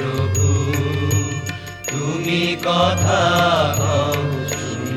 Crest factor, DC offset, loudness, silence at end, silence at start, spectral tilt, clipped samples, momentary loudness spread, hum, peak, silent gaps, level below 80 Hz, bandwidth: 16 dB; under 0.1%; -19 LUFS; 0 s; 0 s; -4.5 dB/octave; under 0.1%; 9 LU; none; -2 dBFS; none; -44 dBFS; 14 kHz